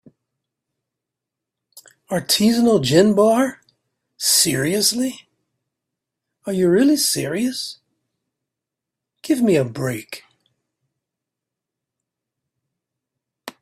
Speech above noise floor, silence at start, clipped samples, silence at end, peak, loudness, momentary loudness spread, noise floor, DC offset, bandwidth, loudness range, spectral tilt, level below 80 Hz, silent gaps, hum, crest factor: 67 dB; 1.75 s; under 0.1%; 0.1 s; -2 dBFS; -18 LUFS; 16 LU; -84 dBFS; under 0.1%; 16 kHz; 8 LU; -4 dB/octave; -62 dBFS; none; none; 20 dB